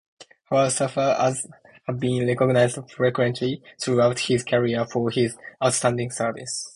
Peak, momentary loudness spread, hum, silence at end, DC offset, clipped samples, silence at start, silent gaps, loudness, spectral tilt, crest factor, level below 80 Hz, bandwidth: -4 dBFS; 8 LU; none; 0.05 s; under 0.1%; under 0.1%; 0.2 s; none; -23 LUFS; -5 dB/octave; 18 dB; -60 dBFS; 11.5 kHz